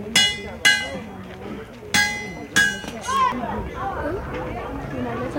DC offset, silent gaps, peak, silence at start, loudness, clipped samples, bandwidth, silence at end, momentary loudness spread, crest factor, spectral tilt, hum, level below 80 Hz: under 0.1%; none; -2 dBFS; 0 s; -22 LUFS; under 0.1%; 16.5 kHz; 0 s; 17 LU; 22 dB; -2 dB/octave; none; -42 dBFS